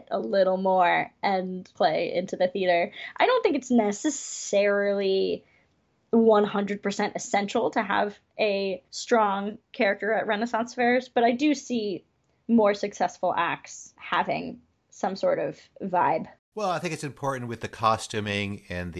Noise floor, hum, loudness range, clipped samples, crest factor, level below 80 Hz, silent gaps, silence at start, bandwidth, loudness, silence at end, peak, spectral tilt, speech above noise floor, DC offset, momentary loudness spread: -68 dBFS; none; 4 LU; under 0.1%; 18 dB; -60 dBFS; 16.39-16.52 s; 0.1 s; 12 kHz; -26 LUFS; 0 s; -8 dBFS; -4.5 dB/octave; 43 dB; under 0.1%; 10 LU